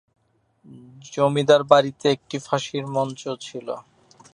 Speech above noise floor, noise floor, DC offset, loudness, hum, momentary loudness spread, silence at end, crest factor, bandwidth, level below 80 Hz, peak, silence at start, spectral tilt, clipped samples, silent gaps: 40 dB; -62 dBFS; under 0.1%; -22 LUFS; none; 17 LU; 0.5 s; 22 dB; 10.5 kHz; -68 dBFS; 0 dBFS; 0.7 s; -5 dB/octave; under 0.1%; none